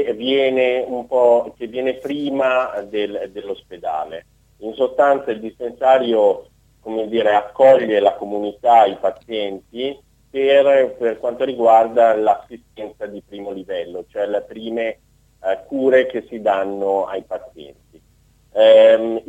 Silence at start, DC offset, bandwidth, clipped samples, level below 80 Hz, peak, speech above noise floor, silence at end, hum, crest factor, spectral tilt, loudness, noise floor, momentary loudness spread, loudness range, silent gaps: 0 s; under 0.1%; 7.8 kHz; under 0.1%; -58 dBFS; -2 dBFS; 38 dB; 0.05 s; none; 16 dB; -5.5 dB/octave; -17 LUFS; -55 dBFS; 17 LU; 6 LU; none